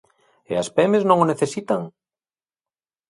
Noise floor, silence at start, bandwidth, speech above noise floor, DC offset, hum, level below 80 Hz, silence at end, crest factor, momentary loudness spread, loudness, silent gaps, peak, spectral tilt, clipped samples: under -90 dBFS; 0.5 s; 11.5 kHz; over 71 dB; under 0.1%; none; -64 dBFS; 1.2 s; 20 dB; 10 LU; -20 LUFS; none; -2 dBFS; -6 dB/octave; under 0.1%